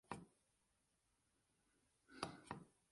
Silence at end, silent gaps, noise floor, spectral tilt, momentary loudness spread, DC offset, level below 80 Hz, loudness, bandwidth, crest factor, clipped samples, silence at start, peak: 0.2 s; none; -85 dBFS; -4 dB/octave; 7 LU; under 0.1%; -80 dBFS; -54 LUFS; 11.5 kHz; 32 dB; under 0.1%; 0.1 s; -26 dBFS